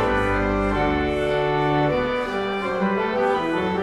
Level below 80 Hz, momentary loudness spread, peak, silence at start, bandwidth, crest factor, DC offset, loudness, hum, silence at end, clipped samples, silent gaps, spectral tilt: -36 dBFS; 3 LU; -8 dBFS; 0 s; 12 kHz; 12 dB; under 0.1%; -22 LUFS; none; 0 s; under 0.1%; none; -7 dB/octave